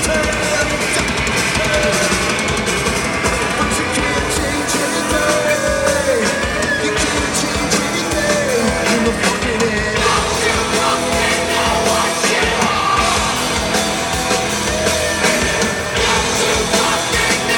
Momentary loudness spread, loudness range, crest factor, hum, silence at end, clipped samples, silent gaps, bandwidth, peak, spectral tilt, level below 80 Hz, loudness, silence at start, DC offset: 2 LU; 1 LU; 16 dB; none; 0 s; under 0.1%; none; 18 kHz; -2 dBFS; -2.5 dB/octave; -32 dBFS; -15 LUFS; 0 s; under 0.1%